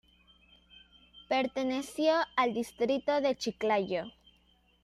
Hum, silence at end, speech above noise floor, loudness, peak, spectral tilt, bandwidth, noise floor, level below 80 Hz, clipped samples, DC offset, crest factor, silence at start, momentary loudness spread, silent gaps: none; 0.75 s; 37 dB; -31 LUFS; -14 dBFS; -4 dB/octave; 14 kHz; -67 dBFS; -68 dBFS; under 0.1%; under 0.1%; 18 dB; 1.15 s; 6 LU; none